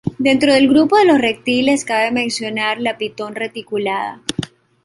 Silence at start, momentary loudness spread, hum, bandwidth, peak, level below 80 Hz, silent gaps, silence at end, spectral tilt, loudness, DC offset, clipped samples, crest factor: 0.05 s; 13 LU; none; 11.5 kHz; -2 dBFS; -54 dBFS; none; 0.4 s; -4 dB/octave; -16 LUFS; under 0.1%; under 0.1%; 14 dB